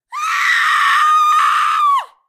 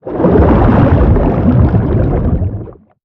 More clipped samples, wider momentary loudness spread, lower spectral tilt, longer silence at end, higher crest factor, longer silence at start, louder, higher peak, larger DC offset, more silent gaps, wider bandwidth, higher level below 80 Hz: neither; second, 4 LU vs 8 LU; second, 4 dB/octave vs -11.5 dB/octave; about the same, 0.25 s vs 0.3 s; about the same, 12 dB vs 10 dB; about the same, 0.1 s vs 0.05 s; about the same, -13 LUFS vs -11 LUFS; about the same, -2 dBFS vs 0 dBFS; neither; neither; first, 16 kHz vs 4.3 kHz; second, -68 dBFS vs -16 dBFS